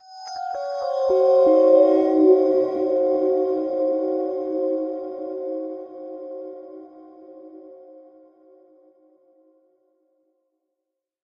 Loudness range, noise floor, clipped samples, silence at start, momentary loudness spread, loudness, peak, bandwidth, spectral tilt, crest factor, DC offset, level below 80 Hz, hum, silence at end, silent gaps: 21 LU; -83 dBFS; under 0.1%; 0.1 s; 20 LU; -20 LUFS; -4 dBFS; 7 kHz; -6 dB/octave; 18 dB; under 0.1%; -68 dBFS; none; 3.25 s; none